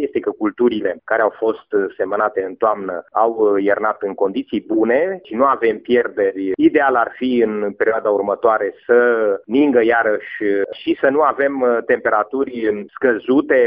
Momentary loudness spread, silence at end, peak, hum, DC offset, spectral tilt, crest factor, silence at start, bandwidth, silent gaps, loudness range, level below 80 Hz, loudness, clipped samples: 7 LU; 0 s; -2 dBFS; none; under 0.1%; -9 dB/octave; 16 dB; 0 s; 4.9 kHz; none; 2 LU; -60 dBFS; -17 LUFS; under 0.1%